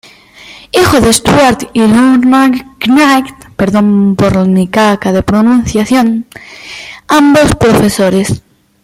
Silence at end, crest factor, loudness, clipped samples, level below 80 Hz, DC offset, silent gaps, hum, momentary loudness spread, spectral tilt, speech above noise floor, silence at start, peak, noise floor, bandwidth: 0.45 s; 8 dB; -8 LUFS; under 0.1%; -32 dBFS; under 0.1%; none; none; 12 LU; -5 dB/octave; 27 dB; 0.5 s; 0 dBFS; -35 dBFS; 16 kHz